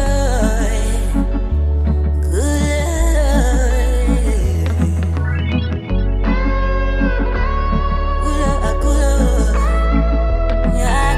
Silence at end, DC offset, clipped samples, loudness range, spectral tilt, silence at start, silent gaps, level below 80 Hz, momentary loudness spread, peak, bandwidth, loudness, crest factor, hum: 0 s; under 0.1%; under 0.1%; 2 LU; -6 dB/octave; 0 s; none; -16 dBFS; 4 LU; -2 dBFS; 13 kHz; -17 LUFS; 12 dB; none